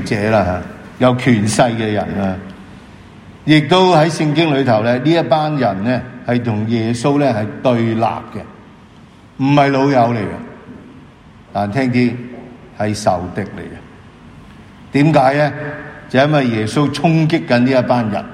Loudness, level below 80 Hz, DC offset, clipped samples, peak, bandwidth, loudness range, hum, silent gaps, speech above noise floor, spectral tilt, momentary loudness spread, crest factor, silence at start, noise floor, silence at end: -15 LUFS; -48 dBFS; under 0.1%; under 0.1%; 0 dBFS; 12.5 kHz; 6 LU; none; none; 27 dB; -6.5 dB/octave; 15 LU; 16 dB; 0 s; -42 dBFS; 0 s